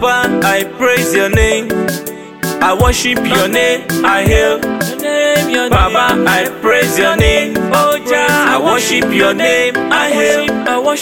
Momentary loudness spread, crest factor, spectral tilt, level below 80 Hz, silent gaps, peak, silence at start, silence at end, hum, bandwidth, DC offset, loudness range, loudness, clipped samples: 5 LU; 12 dB; -4 dB/octave; -26 dBFS; none; 0 dBFS; 0 s; 0 s; none; 17 kHz; 0.3%; 2 LU; -12 LUFS; under 0.1%